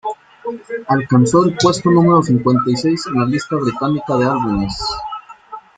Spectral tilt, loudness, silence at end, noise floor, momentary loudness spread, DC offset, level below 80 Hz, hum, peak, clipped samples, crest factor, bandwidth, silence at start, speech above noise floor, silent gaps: -6 dB/octave; -15 LUFS; 0.2 s; -36 dBFS; 16 LU; under 0.1%; -44 dBFS; none; -2 dBFS; under 0.1%; 14 dB; 9.4 kHz; 0.05 s; 21 dB; none